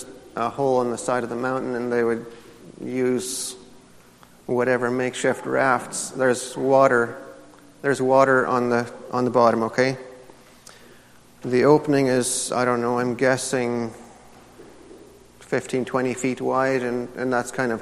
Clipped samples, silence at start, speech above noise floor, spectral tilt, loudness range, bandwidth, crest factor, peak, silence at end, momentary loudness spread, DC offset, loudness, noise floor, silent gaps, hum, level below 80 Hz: under 0.1%; 0 s; 29 dB; -4.5 dB/octave; 6 LU; 14 kHz; 20 dB; -2 dBFS; 0 s; 11 LU; under 0.1%; -22 LUFS; -50 dBFS; none; none; -62 dBFS